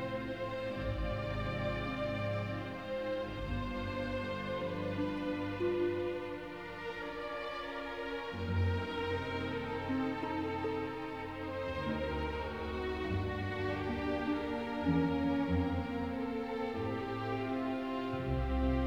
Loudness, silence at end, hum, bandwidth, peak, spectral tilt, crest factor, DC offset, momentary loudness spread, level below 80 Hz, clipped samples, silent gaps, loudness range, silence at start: -37 LUFS; 0 s; none; 13.5 kHz; -20 dBFS; -7.5 dB/octave; 16 dB; under 0.1%; 7 LU; -48 dBFS; under 0.1%; none; 3 LU; 0 s